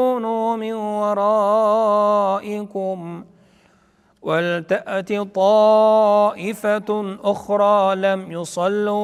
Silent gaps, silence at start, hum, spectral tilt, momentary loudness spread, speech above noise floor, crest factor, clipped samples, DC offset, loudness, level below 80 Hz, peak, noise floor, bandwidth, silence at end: none; 0 s; none; -6 dB/octave; 12 LU; 39 dB; 14 dB; under 0.1%; under 0.1%; -19 LUFS; -66 dBFS; -4 dBFS; -58 dBFS; 13.5 kHz; 0 s